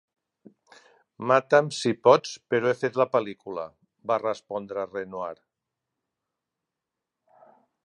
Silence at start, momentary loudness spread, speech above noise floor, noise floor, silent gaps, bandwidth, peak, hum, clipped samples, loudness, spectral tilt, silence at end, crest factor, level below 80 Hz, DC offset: 1.2 s; 16 LU; 62 dB; -86 dBFS; none; 11 kHz; -4 dBFS; none; under 0.1%; -25 LUFS; -5 dB/octave; 2.5 s; 24 dB; -74 dBFS; under 0.1%